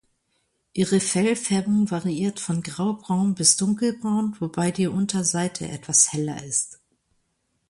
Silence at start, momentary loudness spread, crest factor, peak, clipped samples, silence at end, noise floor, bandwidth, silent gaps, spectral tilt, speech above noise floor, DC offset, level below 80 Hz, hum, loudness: 0.75 s; 10 LU; 22 dB; -2 dBFS; under 0.1%; 0.95 s; -72 dBFS; 11.5 kHz; none; -4 dB/octave; 49 dB; under 0.1%; -60 dBFS; none; -22 LUFS